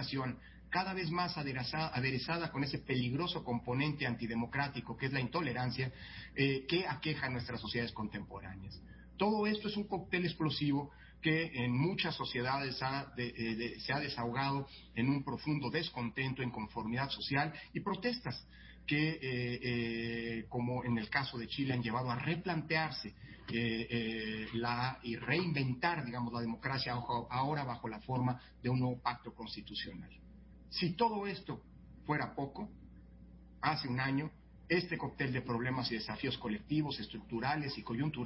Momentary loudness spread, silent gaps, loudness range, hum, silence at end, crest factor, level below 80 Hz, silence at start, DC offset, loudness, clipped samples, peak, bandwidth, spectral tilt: 9 LU; none; 3 LU; none; 0 s; 20 dB; -60 dBFS; 0 s; under 0.1%; -37 LUFS; under 0.1%; -16 dBFS; 5.8 kHz; -9 dB/octave